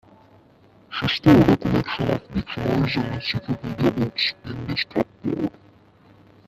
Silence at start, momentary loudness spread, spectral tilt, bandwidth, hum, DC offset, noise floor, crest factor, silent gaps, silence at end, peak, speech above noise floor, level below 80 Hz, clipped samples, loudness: 0.9 s; 12 LU; -7 dB/octave; 14.5 kHz; none; under 0.1%; -53 dBFS; 22 dB; none; 1 s; 0 dBFS; 32 dB; -44 dBFS; under 0.1%; -22 LUFS